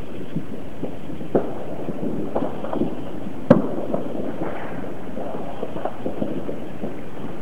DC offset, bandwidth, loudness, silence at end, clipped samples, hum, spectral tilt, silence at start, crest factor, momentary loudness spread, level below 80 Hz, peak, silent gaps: 7%; 16 kHz; -27 LUFS; 0 s; under 0.1%; none; -8.5 dB/octave; 0 s; 26 dB; 11 LU; -48 dBFS; 0 dBFS; none